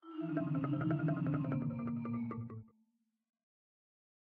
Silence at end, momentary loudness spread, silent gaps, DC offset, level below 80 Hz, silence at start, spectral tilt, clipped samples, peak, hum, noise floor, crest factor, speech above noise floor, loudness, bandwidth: 1.6 s; 9 LU; none; under 0.1%; -74 dBFS; 0.05 s; -9.5 dB/octave; under 0.1%; -24 dBFS; none; -79 dBFS; 16 dB; 44 dB; -38 LUFS; 3.6 kHz